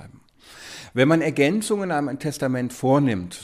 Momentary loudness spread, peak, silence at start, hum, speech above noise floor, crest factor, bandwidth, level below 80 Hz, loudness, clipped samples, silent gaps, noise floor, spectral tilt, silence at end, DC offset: 14 LU; -4 dBFS; 0 s; none; 27 dB; 18 dB; 15.5 kHz; -60 dBFS; -22 LUFS; under 0.1%; none; -49 dBFS; -6 dB/octave; 0 s; under 0.1%